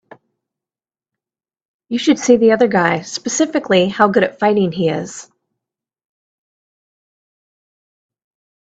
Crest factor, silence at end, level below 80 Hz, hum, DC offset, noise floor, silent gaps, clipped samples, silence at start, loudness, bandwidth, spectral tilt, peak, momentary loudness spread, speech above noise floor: 18 dB; 3.4 s; -60 dBFS; none; under 0.1%; under -90 dBFS; none; under 0.1%; 1.9 s; -15 LUFS; 9 kHz; -4.5 dB/octave; 0 dBFS; 11 LU; over 75 dB